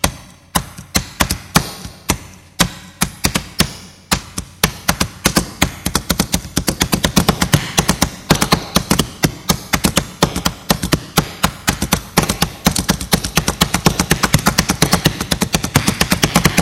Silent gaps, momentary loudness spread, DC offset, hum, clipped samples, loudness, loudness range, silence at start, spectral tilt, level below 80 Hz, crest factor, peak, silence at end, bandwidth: none; 6 LU; under 0.1%; none; 0.1%; -16 LUFS; 4 LU; 0.05 s; -3.5 dB/octave; -30 dBFS; 18 dB; 0 dBFS; 0 s; over 20 kHz